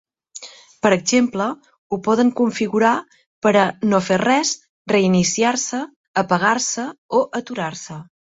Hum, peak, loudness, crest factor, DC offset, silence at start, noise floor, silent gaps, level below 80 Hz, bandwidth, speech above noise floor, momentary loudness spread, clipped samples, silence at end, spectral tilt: none; -2 dBFS; -19 LUFS; 18 dB; under 0.1%; 0.35 s; -40 dBFS; 1.78-1.90 s, 3.26-3.42 s, 4.69-4.85 s, 5.96-6.14 s, 6.98-7.09 s; -60 dBFS; 8 kHz; 22 dB; 17 LU; under 0.1%; 0.35 s; -4 dB/octave